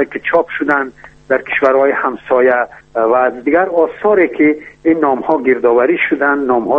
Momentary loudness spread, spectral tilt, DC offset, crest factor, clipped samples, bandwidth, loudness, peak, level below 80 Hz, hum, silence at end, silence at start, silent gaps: 6 LU; -7.5 dB/octave; under 0.1%; 14 dB; under 0.1%; 5.8 kHz; -13 LUFS; 0 dBFS; -52 dBFS; none; 0 s; 0 s; none